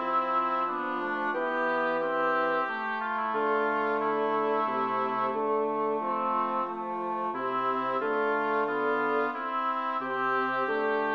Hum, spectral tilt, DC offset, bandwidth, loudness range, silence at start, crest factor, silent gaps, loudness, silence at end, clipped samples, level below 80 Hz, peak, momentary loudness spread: none; -6.5 dB/octave; under 0.1%; 6.6 kHz; 1 LU; 0 s; 12 dB; none; -28 LUFS; 0 s; under 0.1%; -80 dBFS; -16 dBFS; 4 LU